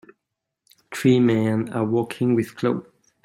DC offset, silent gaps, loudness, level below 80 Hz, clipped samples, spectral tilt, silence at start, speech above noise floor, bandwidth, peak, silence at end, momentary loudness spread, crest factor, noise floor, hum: under 0.1%; none; -22 LUFS; -62 dBFS; under 0.1%; -7 dB/octave; 0.9 s; 62 dB; 15.5 kHz; -6 dBFS; 0.45 s; 7 LU; 18 dB; -82 dBFS; none